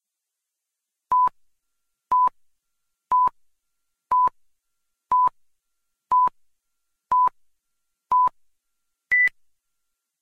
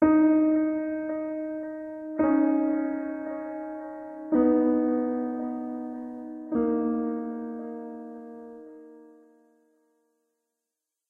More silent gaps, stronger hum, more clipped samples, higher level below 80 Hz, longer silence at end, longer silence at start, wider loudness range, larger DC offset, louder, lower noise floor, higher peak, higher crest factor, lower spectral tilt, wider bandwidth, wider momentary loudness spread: neither; neither; neither; about the same, -64 dBFS vs -62 dBFS; second, 0.95 s vs 2.05 s; first, 1.1 s vs 0 s; second, 1 LU vs 15 LU; neither; first, -22 LUFS vs -27 LUFS; about the same, -84 dBFS vs -86 dBFS; about the same, -12 dBFS vs -10 dBFS; about the same, 14 dB vs 18 dB; second, -3.5 dB/octave vs -10.5 dB/octave; first, 5.4 kHz vs 2.7 kHz; second, 5 LU vs 17 LU